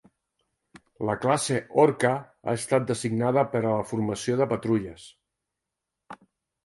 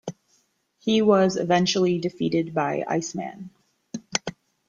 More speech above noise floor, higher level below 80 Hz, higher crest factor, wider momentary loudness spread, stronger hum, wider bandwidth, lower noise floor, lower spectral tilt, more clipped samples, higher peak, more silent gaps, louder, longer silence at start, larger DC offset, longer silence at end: first, 60 dB vs 45 dB; about the same, -62 dBFS vs -64 dBFS; about the same, 22 dB vs 22 dB; second, 9 LU vs 20 LU; neither; first, 11.5 kHz vs 7.8 kHz; first, -85 dBFS vs -67 dBFS; about the same, -5.5 dB/octave vs -5 dB/octave; neither; second, -6 dBFS vs -2 dBFS; neither; second, -26 LUFS vs -23 LUFS; first, 1 s vs 0.05 s; neither; about the same, 0.5 s vs 0.4 s